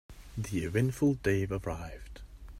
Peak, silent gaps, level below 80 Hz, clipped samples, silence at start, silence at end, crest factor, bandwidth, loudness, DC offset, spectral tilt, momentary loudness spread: -14 dBFS; none; -48 dBFS; under 0.1%; 0.1 s; 0 s; 18 dB; 16 kHz; -32 LUFS; under 0.1%; -7 dB/octave; 20 LU